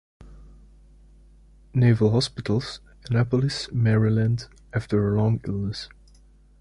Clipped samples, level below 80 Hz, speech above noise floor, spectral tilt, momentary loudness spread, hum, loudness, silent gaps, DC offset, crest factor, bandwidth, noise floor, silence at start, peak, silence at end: under 0.1%; -48 dBFS; 31 dB; -7 dB/octave; 11 LU; none; -24 LUFS; none; under 0.1%; 16 dB; 11 kHz; -53 dBFS; 0.2 s; -8 dBFS; 0.75 s